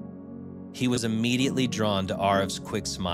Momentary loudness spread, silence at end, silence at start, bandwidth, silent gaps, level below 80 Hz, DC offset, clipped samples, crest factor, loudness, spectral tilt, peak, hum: 16 LU; 0 s; 0 s; 15.5 kHz; none; -56 dBFS; under 0.1%; under 0.1%; 16 dB; -26 LUFS; -5 dB/octave; -10 dBFS; none